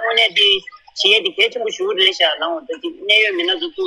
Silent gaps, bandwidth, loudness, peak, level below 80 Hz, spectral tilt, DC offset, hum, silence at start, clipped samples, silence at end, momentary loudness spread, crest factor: none; 12.5 kHz; -15 LUFS; 0 dBFS; -62 dBFS; -0.5 dB/octave; under 0.1%; none; 0 s; under 0.1%; 0 s; 12 LU; 16 dB